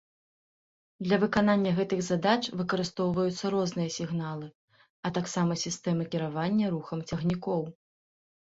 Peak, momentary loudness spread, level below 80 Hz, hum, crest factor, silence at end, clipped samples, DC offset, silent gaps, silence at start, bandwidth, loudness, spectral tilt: -10 dBFS; 9 LU; -62 dBFS; none; 20 dB; 0.85 s; under 0.1%; under 0.1%; 4.55-4.68 s, 4.90-5.03 s; 1 s; 8 kHz; -29 LUFS; -5.5 dB/octave